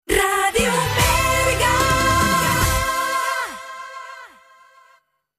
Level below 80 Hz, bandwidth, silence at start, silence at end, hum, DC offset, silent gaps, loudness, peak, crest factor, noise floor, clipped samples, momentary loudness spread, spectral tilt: -32 dBFS; 15.5 kHz; 0.1 s; 1.1 s; none; under 0.1%; none; -18 LUFS; -4 dBFS; 16 dB; -58 dBFS; under 0.1%; 17 LU; -3 dB/octave